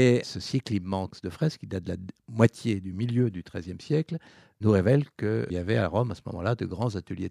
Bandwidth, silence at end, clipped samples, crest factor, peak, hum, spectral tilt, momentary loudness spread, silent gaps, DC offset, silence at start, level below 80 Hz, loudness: 11.5 kHz; 0 s; under 0.1%; 24 dB; -4 dBFS; none; -7.5 dB/octave; 13 LU; none; under 0.1%; 0 s; -56 dBFS; -28 LUFS